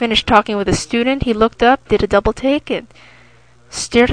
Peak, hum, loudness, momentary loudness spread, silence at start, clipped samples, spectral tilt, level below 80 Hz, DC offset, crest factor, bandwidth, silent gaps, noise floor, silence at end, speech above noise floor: 0 dBFS; none; -15 LUFS; 11 LU; 0 s; under 0.1%; -4.5 dB/octave; -34 dBFS; 0.3%; 16 dB; 10 kHz; none; -48 dBFS; 0 s; 33 dB